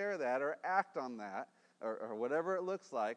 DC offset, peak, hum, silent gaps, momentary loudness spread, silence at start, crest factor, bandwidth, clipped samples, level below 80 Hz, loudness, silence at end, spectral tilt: under 0.1%; -18 dBFS; none; none; 10 LU; 0 s; 20 dB; 10 kHz; under 0.1%; under -90 dBFS; -39 LUFS; 0 s; -5.5 dB/octave